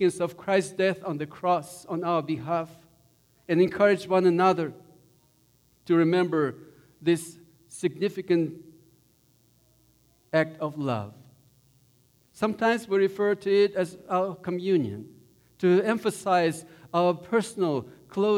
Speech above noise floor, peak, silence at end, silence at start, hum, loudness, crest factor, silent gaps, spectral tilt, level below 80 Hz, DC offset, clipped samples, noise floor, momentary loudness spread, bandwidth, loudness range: 39 dB; -10 dBFS; 0 s; 0 s; none; -26 LUFS; 18 dB; none; -6 dB/octave; -70 dBFS; under 0.1%; under 0.1%; -64 dBFS; 11 LU; 14.5 kHz; 6 LU